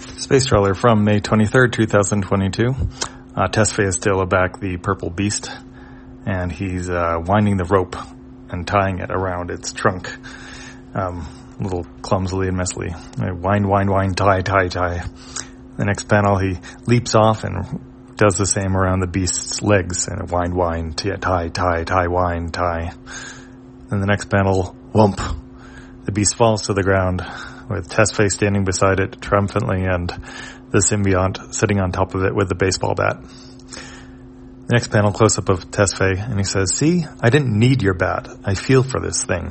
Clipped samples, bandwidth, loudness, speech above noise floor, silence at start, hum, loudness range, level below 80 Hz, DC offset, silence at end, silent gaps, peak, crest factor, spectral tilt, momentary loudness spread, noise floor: under 0.1%; 8.8 kHz; -19 LUFS; 21 dB; 0 s; none; 4 LU; -40 dBFS; under 0.1%; 0 s; none; 0 dBFS; 18 dB; -5 dB/octave; 16 LU; -39 dBFS